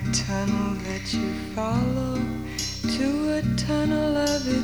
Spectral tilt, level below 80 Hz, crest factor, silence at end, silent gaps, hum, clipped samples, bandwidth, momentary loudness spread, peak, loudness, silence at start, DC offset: -5 dB/octave; -40 dBFS; 14 dB; 0 s; none; none; under 0.1%; 20 kHz; 6 LU; -10 dBFS; -25 LUFS; 0 s; 0.4%